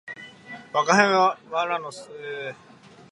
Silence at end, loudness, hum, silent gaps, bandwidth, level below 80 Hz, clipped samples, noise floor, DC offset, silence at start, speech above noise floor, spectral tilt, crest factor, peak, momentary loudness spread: 0.55 s; -22 LUFS; none; none; 11.5 kHz; -76 dBFS; under 0.1%; -43 dBFS; under 0.1%; 0.05 s; 20 dB; -3.5 dB/octave; 24 dB; -2 dBFS; 22 LU